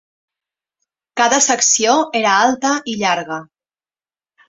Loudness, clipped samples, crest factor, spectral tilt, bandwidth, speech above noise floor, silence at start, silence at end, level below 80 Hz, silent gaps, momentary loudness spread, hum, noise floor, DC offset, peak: -14 LUFS; under 0.1%; 16 dB; -1 dB/octave; 8 kHz; over 75 dB; 1.15 s; 1.05 s; -64 dBFS; none; 12 LU; none; under -90 dBFS; under 0.1%; -2 dBFS